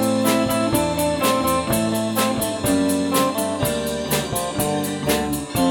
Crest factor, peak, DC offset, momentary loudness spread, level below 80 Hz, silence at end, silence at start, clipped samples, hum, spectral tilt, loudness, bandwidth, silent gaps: 16 dB; -4 dBFS; under 0.1%; 4 LU; -42 dBFS; 0 s; 0 s; under 0.1%; none; -4 dB/octave; -20 LUFS; 19.5 kHz; none